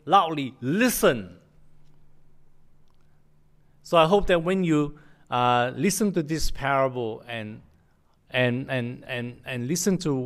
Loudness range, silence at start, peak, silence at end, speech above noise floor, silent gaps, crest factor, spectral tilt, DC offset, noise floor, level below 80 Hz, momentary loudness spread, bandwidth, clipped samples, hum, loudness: 5 LU; 0.05 s; -6 dBFS; 0 s; 38 dB; none; 20 dB; -5 dB/octave; under 0.1%; -61 dBFS; -42 dBFS; 12 LU; 15.5 kHz; under 0.1%; none; -25 LUFS